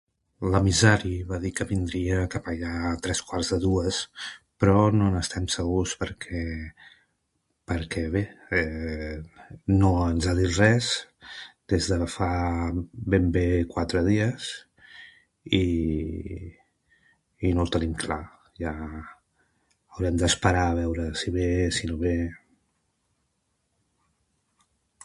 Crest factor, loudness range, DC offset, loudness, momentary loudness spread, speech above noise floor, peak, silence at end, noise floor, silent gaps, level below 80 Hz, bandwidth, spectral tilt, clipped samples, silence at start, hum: 24 dB; 6 LU; under 0.1%; -26 LUFS; 16 LU; 50 dB; -4 dBFS; 2.65 s; -75 dBFS; none; -38 dBFS; 11.5 kHz; -5 dB/octave; under 0.1%; 0.4 s; none